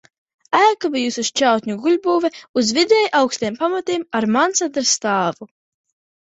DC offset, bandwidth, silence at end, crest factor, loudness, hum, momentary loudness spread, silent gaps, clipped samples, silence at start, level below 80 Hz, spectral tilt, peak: under 0.1%; 8.4 kHz; 0.85 s; 18 dB; -18 LUFS; none; 7 LU; 2.49-2.54 s; under 0.1%; 0.5 s; -64 dBFS; -2.5 dB/octave; -2 dBFS